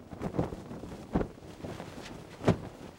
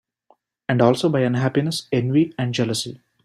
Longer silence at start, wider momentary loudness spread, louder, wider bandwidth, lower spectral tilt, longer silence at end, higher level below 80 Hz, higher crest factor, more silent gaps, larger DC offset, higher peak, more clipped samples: second, 0 s vs 0.7 s; first, 14 LU vs 8 LU; second, -36 LUFS vs -20 LUFS; first, 16.5 kHz vs 14 kHz; about the same, -7 dB/octave vs -6 dB/octave; second, 0 s vs 0.3 s; first, -50 dBFS vs -60 dBFS; first, 24 dB vs 18 dB; neither; neither; second, -12 dBFS vs -4 dBFS; neither